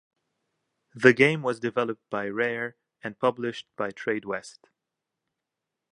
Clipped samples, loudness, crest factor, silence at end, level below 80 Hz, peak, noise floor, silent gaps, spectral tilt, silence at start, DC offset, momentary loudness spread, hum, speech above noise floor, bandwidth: under 0.1%; -26 LUFS; 28 dB; 1.45 s; -74 dBFS; -2 dBFS; -86 dBFS; none; -6 dB/octave; 0.95 s; under 0.1%; 15 LU; none; 60 dB; 11 kHz